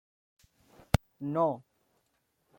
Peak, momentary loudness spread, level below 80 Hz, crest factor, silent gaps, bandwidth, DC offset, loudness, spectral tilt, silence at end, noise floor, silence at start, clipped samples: -8 dBFS; 6 LU; -48 dBFS; 28 dB; none; 16.5 kHz; under 0.1%; -32 LUFS; -6.5 dB/octave; 1 s; -76 dBFS; 1.2 s; under 0.1%